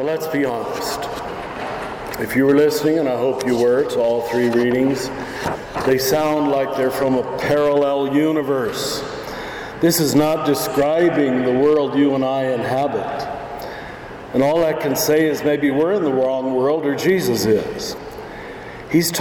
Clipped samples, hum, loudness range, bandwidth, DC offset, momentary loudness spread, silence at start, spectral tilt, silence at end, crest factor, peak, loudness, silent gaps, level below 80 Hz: under 0.1%; none; 3 LU; 19.5 kHz; under 0.1%; 12 LU; 0 s; -5 dB/octave; 0 s; 14 dB; -4 dBFS; -19 LUFS; none; -48 dBFS